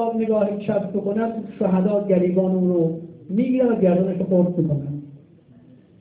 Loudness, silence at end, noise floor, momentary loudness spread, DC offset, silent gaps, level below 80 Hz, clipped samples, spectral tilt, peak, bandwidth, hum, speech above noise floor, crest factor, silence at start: -21 LUFS; 0.8 s; -49 dBFS; 8 LU; under 0.1%; none; -58 dBFS; under 0.1%; -13 dB/octave; -6 dBFS; 4 kHz; none; 29 dB; 14 dB; 0 s